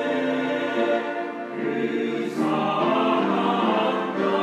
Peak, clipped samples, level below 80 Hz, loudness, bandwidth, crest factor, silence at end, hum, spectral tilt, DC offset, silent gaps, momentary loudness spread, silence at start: -10 dBFS; under 0.1%; -74 dBFS; -24 LUFS; 13 kHz; 14 dB; 0 s; none; -6 dB/octave; under 0.1%; none; 6 LU; 0 s